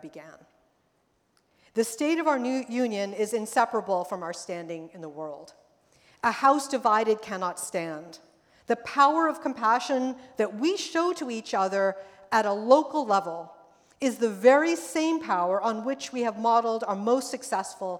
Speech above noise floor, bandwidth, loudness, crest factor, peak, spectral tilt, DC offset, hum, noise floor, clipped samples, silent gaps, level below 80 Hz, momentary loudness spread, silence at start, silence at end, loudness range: 44 dB; 17.5 kHz; -26 LUFS; 22 dB; -6 dBFS; -4 dB/octave; under 0.1%; none; -70 dBFS; under 0.1%; none; -76 dBFS; 14 LU; 0.05 s; 0 s; 5 LU